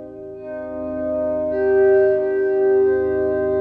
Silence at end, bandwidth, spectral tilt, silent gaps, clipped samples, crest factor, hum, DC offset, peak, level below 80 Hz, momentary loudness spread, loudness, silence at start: 0 s; 2.9 kHz; -10 dB/octave; none; under 0.1%; 12 dB; none; under 0.1%; -6 dBFS; -48 dBFS; 16 LU; -18 LUFS; 0 s